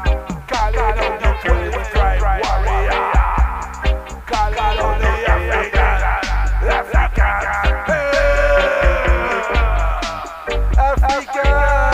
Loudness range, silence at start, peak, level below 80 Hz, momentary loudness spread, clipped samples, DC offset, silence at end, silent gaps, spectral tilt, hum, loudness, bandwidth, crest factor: 2 LU; 0 s; 0 dBFS; -18 dBFS; 7 LU; under 0.1%; under 0.1%; 0 s; none; -5.5 dB/octave; none; -17 LUFS; 8.6 kHz; 14 dB